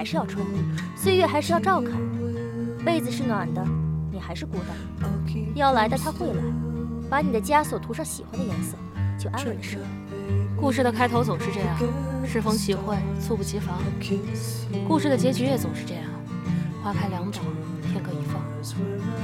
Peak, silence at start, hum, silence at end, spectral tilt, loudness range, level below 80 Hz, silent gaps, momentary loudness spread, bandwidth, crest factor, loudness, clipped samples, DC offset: -8 dBFS; 0 s; none; 0 s; -6 dB/octave; 3 LU; -44 dBFS; none; 9 LU; 16.5 kHz; 18 dB; -26 LUFS; under 0.1%; under 0.1%